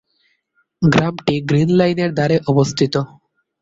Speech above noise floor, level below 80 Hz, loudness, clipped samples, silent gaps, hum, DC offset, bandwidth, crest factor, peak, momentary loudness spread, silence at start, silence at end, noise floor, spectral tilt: 49 dB; -48 dBFS; -16 LUFS; under 0.1%; none; none; under 0.1%; 7.8 kHz; 16 dB; -2 dBFS; 5 LU; 0.8 s; 0.55 s; -65 dBFS; -6.5 dB/octave